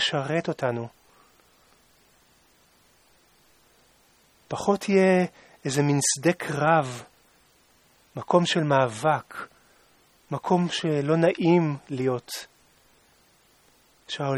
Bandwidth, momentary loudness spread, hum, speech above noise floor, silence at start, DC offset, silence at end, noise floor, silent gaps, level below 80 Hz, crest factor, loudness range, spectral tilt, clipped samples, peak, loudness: 14.5 kHz; 15 LU; none; 37 dB; 0 s; under 0.1%; 0 s; -61 dBFS; none; -68 dBFS; 22 dB; 8 LU; -5 dB/octave; under 0.1%; -6 dBFS; -24 LUFS